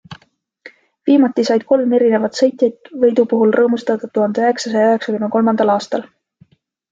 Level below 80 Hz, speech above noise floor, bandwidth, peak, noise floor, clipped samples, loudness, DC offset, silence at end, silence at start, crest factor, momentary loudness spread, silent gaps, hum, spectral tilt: -62 dBFS; 38 dB; 7.8 kHz; -2 dBFS; -53 dBFS; under 0.1%; -15 LUFS; under 0.1%; 0.9 s; 0.1 s; 14 dB; 6 LU; none; none; -5.5 dB/octave